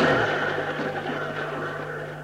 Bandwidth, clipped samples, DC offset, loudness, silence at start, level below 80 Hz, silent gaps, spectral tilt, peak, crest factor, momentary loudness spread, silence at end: 16 kHz; under 0.1%; under 0.1%; -27 LUFS; 0 s; -56 dBFS; none; -5.5 dB/octave; -8 dBFS; 18 dB; 9 LU; 0 s